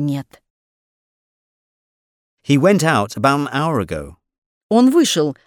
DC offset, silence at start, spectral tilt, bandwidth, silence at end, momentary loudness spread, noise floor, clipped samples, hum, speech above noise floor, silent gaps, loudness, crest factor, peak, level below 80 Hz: under 0.1%; 0 s; -5.5 dB/octave; 18.5 kHz; 0.15 s; 14 LU; under -90 dBFS; under 0.1%; none; over 74 dB; 0.50-2.37 s, 4.38-4.69 s; -16 LUFS; 18 dB; -2 dBFS; -50 dBFS